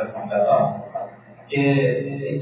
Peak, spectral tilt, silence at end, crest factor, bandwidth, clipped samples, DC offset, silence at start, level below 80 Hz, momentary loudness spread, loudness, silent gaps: -6 dBFS; -11 dB/octave; 0 s; 16 dB; 4 kHz; under 0.1%; under 0.1%; 0 s; -62 dBFS; 14 LU; -21 LUFS; none